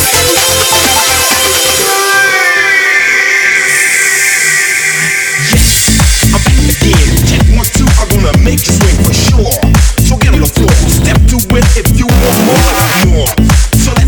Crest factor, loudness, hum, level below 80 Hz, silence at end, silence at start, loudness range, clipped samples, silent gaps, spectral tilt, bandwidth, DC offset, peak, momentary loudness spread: 8 dB; -7 LUFS; none; -12 dBFS; 0 s; 0 s; 2 LU; 0.7%; none; -3.5 dB/octave; over 20 kHz; under 0.1%; 0 dBFS; 3 LU